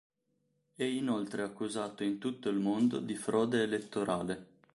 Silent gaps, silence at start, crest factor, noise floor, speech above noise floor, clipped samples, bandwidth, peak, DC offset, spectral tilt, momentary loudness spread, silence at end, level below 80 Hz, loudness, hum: none; 0.8 s; 16 dB; -78 dBFS; 45 dB; under 0.1%; 11.5 kHz; -18 dBFS; under 0.1%; -5.5 dB/octave; 7 LU; 0.3 s; -72 dBFS; -34 LUFS; none